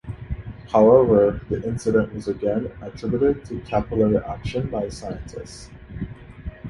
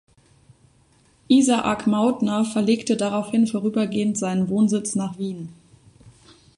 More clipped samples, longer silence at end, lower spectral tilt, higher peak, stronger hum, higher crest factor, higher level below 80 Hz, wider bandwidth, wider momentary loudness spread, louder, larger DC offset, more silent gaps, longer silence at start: neither; second, 0 s vs 0.45 s; first, -8 dB/octave vs -5.5 dB/octave; about the same, -2 dBFS vs -4 dBFS; neither; about the same, 20 dB vs 18 dB; first, -40 dBFS vs -60 dBFS; about the same, 11.5 kHz vs 11.5 kHz; first, 21 LU vs 9 LU; about the same, -21 LUFS vs -21 LUFS; neither; neither; second, 0.05 s vs 1.3 s